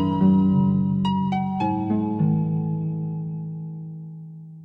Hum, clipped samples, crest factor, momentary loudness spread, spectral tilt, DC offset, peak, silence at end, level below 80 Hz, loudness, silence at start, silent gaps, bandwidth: none; under 0.1%; 14 dB; 18 LU; -10 dB/octave; under 0.1%; -8 dBFS; 0 s; -54 dBFS; -23 LUFS; 0 s; none; 5 kHz